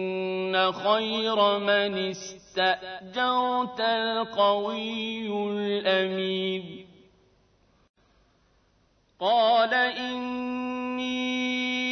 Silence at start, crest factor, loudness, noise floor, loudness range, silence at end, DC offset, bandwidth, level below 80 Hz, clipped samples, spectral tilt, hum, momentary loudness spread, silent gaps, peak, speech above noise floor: 0 s; 18 dB; -26 LUFS; -66 dBFS; 5 LU; 0 s; under 0.1%; 6.6 kHz; -70 dBFS; under 0.1%; -4 dB/octave; none; 8 LU; 7.89-7.94 s; -10 dBFS; 40 dB